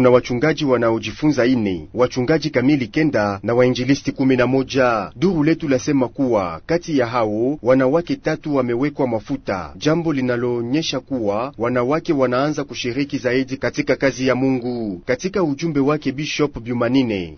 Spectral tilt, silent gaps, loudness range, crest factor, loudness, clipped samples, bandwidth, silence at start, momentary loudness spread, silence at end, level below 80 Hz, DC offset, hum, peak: -6 dB/octave; none; 3 LU; 18 dB; -19 LUFS; under 0.1%; 6.6 kHz; 0 s; 6 LU; 0 s; -46 dBFS; under 0.1%; none; 0 dBFS